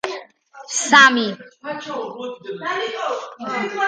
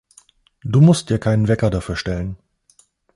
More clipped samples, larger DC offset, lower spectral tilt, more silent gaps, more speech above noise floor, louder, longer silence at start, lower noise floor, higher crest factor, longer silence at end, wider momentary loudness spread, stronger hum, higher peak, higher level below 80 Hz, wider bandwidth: neither; neither; second, -1.5 dB/octave vs -7 dB/octave; neither; second, 23 dB vs 41 dB; about the same, -18 LUFS vs -18 LUFS; second, 0.05 s vs 0.65 s; second, -42 dBFS vs -57 dBFS; about the same, 20 dB vs 16 dB; second, 0 s vs 0.8 s; first, 20 LU vs 17 LU; neither; first, 0 dBFS vs -4 dBFS; second, -72 dBFS vs -38 dBFS; second, 10 kHz vs 11.5 kHz